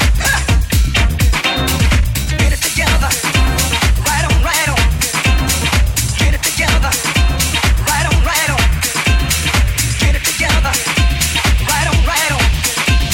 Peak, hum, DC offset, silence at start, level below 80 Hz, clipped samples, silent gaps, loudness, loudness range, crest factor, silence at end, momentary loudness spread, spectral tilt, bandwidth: 0 dBFS; none; under 0.1%; 0 s; -16 dBFS; under 0.1%; none; -13 LUFS; 0 LU; 12 dB; 0 s; 1 LU; -3 dB/octave; 18.5 kHz